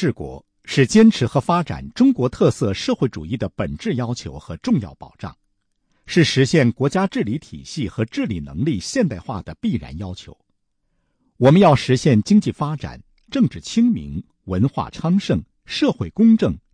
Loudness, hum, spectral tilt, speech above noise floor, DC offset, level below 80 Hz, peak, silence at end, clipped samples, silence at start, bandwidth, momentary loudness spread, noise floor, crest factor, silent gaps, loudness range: -19 LUFS; none; -6.5 dB/octave; 50 dB; under 0.1%; -44 dBFS; -4 dBFS; 0.15 s; under 0.1%; 0 s; 10.5 kHz; 17 LU; -69 dBFS; 16 dB; none; 7 LU